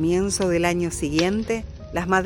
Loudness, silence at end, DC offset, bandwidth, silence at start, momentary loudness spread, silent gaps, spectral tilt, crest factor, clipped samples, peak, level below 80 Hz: -23 LUFS; 0 s; under 0.1%; 17 kHz; 0 s; 8 LU; none; -4.5 dB/octave; 16 dB; under 0.1%; -6 dBFS; -40 dBFS